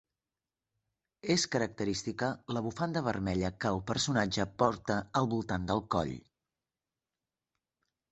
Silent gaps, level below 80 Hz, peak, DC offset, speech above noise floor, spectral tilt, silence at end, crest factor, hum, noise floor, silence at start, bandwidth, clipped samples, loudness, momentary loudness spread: none; -56 dBFS; -12 dBFS; under 0.1%; over 58 dB; -4.5 dB/octave; 1.9 s; 24 dB; none; under -90 dBFS; 1.25 s; 8.4 kHz; under 0.1%; -33 LUFS; 6 LU